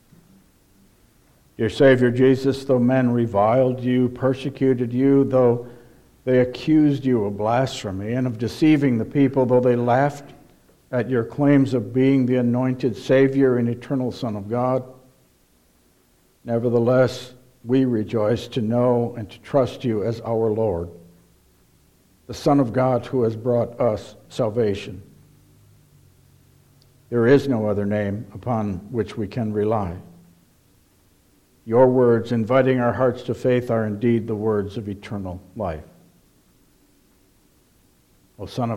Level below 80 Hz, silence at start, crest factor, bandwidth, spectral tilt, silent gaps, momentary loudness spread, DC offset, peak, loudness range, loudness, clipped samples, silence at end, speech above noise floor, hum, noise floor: -54 dBFS; 1.6 s; 18 dB; 13 kHz; -8 dB/octave; none; 13 LU; under 0.1%; -4 dBFS; 8 LU; -21 LUFS; under 0.1%; 0 s; 40 dB; none; -59 dBFS